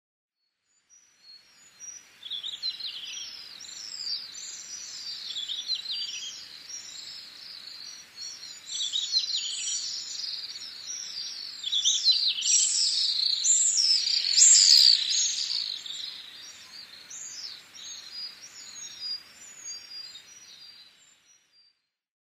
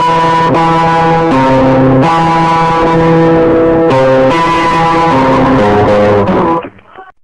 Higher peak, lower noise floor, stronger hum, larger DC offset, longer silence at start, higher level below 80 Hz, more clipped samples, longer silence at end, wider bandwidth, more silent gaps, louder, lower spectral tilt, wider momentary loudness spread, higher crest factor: second, -6 dBFS vs -2 dBFS; first, -75 dBFS vs -34 dBFS; neither; neither; first, 1.25 s vs 0 s; second, -82 dBFS vs -30 dBFS; neither; first, 1.5 s vs 0.2 s; first, 15.5 kHz vs 10.5 kHz; neither; second, -23 LUFS vs -8 LUFS; second, 5 dB/octave vs -7 dB/octave; first, 21 LU vs 2 LU; first, 24 dB vs 6 dB